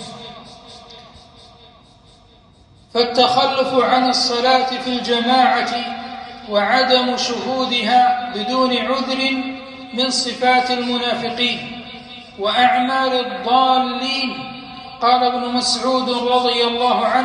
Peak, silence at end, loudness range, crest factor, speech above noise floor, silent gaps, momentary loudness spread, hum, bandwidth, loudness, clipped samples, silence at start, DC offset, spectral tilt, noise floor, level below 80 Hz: -2 dBFS; 0 s; 3 LU; 16 dB; 32 dB; none; 16 LU; none; 11 kHz; -17 LUFS; under 0.1%; 0 s; under 0.1%; -2.5 dB/octave; -49 dBFS; -56 dBFS